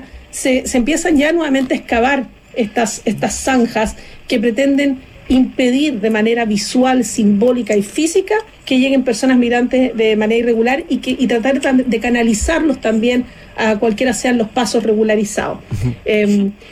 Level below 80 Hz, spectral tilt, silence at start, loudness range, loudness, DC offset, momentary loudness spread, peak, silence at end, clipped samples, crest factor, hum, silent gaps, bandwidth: -38 dBFS; -4.5 dB/octave; 0 s; 2 LU; -15 LUFS; under 0.1%; 6 LU; -4 dBFS; 0 s; under 0.1%; 12 dB; none; none; 14 kHz